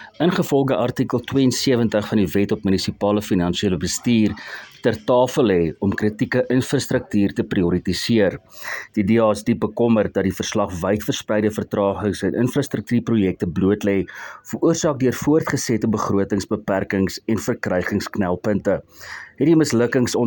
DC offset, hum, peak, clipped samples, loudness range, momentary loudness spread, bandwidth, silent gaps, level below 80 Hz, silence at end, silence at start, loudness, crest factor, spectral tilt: under 0.1%; none; -4 dBFS; under 0.1%; 2 LU; 6 LU; 17.5 kHz; none; -52 dBFS; 0 s; 0 s; -20 LUFS; 16 dB; -5.5 dB/octave